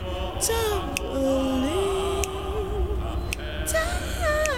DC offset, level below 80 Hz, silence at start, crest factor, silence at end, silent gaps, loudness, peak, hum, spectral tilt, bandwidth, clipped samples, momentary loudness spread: 0.6%; -32 dBFS; 0 s; 20 dB; 0 s; none; -26 LUFS; -6 dBFS; none; -4 dB/octave; 16.5 kHz; under 0.1%; 6 LU